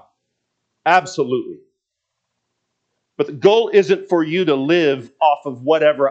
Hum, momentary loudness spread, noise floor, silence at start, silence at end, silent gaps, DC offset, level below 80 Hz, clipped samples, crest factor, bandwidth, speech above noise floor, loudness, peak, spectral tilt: none; 9 LU; -78 dBFS; 0.85 s; 0 s; none; under 0.1%; -74 dBFS; under 0.1%; 18 dB; 8 kHz; 62 dB; -17 LUFS; 0 dBFS; -5.5 dB/octave